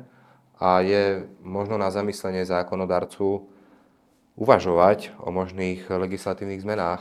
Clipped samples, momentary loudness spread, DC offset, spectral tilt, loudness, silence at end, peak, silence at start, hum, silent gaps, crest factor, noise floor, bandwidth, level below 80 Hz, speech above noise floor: under 0.1%; 11 LU; under 0.1%; -6.5 dB/octave; -24 LUFS; 0 s; 0 dBFS; 0.6 s; none; none; 24 dB; -62 dBFS; 14 kHz; -64 dBFS; 38 dB